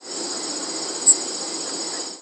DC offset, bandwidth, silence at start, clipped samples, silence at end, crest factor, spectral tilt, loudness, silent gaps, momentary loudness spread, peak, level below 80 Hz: under 0.1%; 11 kHz; 0 s; under 0.1%; 0 s; 22 dB; 0.5 dB/octave; -21 LUFS; none; 11 LU; -2 dBFS; -78 dBFS